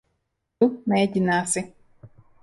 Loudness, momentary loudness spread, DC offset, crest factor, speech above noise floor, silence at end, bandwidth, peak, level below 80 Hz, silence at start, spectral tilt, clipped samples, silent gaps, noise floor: -23 LUFS; 6 LU; under 0.1%; 18 dB; 54 dB; 0.35 s; 11.5 kHz; -8 dBFS; -62 dBFS; 0.6 s; -5 dB/octave; under 0.1%; none; -76 dBFS